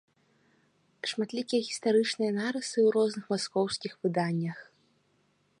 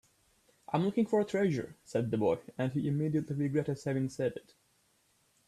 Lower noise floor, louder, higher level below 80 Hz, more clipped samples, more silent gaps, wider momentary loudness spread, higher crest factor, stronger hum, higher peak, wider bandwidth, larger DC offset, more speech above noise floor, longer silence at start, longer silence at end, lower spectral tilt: about the same, -70 dBFS vs -72 dBFS; first, -30 LUFS vs -33 LUFS; second, -78 dBFS vs -68 dBFS; neither; neither; about the same, 8 LU vs 6 LU; about the same, 16 dB vs 16 dB; neither; about the same, -14 dBFS vs -16 dBFS; second, 11 kHz vs 13 kHz; neither; about the same, 42 dB vs 40 dB; first, 1.05 s vs 0.7 s; second, 0.95 s vs 1.1 s; second, -5 dB/octave vs -8 dB/octave